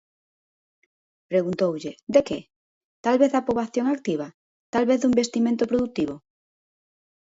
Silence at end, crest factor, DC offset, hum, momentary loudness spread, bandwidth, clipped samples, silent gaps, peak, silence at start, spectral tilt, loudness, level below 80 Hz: 1.05 s; 20 dB; under 0.1%; none; 11 LU; 8 kHz; under 0.1%; 2.03-2.07 s, 2.56-3.04 s, 4.34-4.73 s; -6 dBFS; 1.3 s; -5.5 dB/octave; -24 LUFS; -60 dBFS